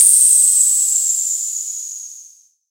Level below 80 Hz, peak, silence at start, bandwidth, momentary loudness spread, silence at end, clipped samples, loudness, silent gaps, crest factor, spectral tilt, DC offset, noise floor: -88 dBFS; 0 dBFS; 0 s; 16 kHz; 19 LU; 0.5 s; under 0.1%; -11 LUFS; none; 16 dB; 9 dB/octave; under 0.1%; -46 dBFS